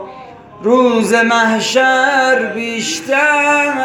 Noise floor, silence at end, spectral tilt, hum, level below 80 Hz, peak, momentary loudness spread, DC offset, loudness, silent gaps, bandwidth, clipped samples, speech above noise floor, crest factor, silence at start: -35 dBFS; 0 s; -3 dB/octave; none; -60 dBFS; 0 dBFS; 8 LU; under 0.1%; -12 LUFS; none; 17.5 kHz; under 0.1%; 22 dB; 12 dB; 0 s